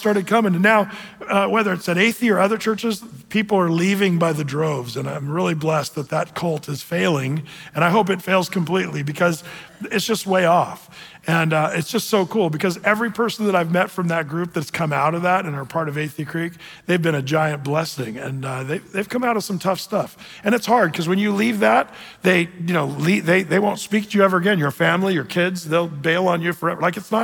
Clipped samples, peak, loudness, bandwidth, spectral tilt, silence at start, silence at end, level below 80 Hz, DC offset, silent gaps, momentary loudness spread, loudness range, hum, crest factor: under 0.1%; -4 dBFS; -20 LUFS; 19.5 kHz; -5.5 dB/octave; 0 s; 0 s; -62 dBFS; under 0.1%; none; 9 LU; 4 LU; none; 16 dB